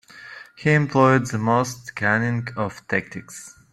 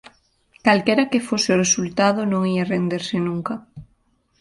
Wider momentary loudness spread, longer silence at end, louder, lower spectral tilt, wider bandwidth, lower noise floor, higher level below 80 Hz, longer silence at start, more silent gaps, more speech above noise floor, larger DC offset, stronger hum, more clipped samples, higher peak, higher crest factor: first, 22 LU vs 7 LU; second, 0.2 s vs 0.55 s; about the same, -21 LUFS vs -20 LUFS; first, -6 dB/octave vs -4 dB/octave; first, 13.5 kHz vs 11.5 kHz; second, -42 dBFS vs -63 dBFS; about the same, -58 dBFS vs -56 dBFS; second, 0.15 s vs 0.65 s; neither; second, 21 dB vs 44 dB; neither; neither; neither; about the same, -2 dBFS vs -4 dBFS; about the same, 20 dB vs 18 dB